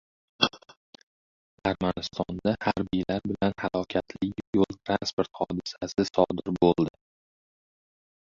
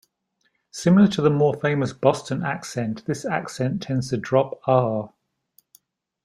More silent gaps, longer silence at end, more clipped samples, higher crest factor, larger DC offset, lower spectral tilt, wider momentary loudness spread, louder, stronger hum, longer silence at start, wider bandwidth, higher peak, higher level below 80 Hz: first, 0.77-0.93 s, 1.03-1.58 s, 4.47-4.53 s, 5.13-5.18 s vs none; first, 1.4 s vs 1.2 s; neither; first, 28 dB vs 20 dB; neither; about the same, -6 dB/octave vs -6.5 dB/octave; second, 7 LU vs 11 LU; second, -28 LUFS vs -22 LUFS; neither; second, 0.4 s vs 0.75 s; second, 7.6 kHz vs 12.5 kHz; first, 0 dBFS vs -4 dBFS; first, -54 dBFS vs -60 dBFS